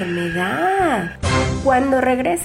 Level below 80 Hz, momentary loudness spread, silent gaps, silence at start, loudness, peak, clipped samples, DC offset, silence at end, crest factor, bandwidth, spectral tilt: -38 dBFS; 5 LU; none; 0 s; -18 LUFS; -6 dBFS; under 0.1%; under 0.1%; 0 s; 12 dB; 16.5 kHz; -5.5 dB/octave